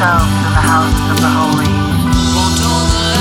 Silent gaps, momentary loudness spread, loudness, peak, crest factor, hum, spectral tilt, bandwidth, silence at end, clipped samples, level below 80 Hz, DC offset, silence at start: none; 2 LU; -12 LUFS; 0 dBFS; 10 dB; none; -4.5 dB/octave; 18 kHz; 0 s; under 0.1%; -22 dBFS; under 0.1%; 0 s